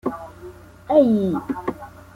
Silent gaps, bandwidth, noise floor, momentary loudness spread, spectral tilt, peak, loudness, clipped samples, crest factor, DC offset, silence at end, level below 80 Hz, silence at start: none; 15.5 kHz; -41 dBFS; 24 LU; -8.5 dB/octave; -4 dBFS; -20 LUFS; under 0.1%; 18 dB; under 0.1%; 0.25 s; -52 dBFS; 0.05 s